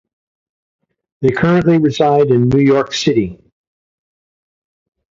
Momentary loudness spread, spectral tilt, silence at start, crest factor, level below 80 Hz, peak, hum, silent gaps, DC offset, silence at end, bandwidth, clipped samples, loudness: 7 LU; -6.5 dB/octave; 1.2 s; 16 dB; -46 dBFS; 0 dBFS; none; none; under 0.1%; 1.8 s; 7.6 kHz; under 0.1%; -13 LUFS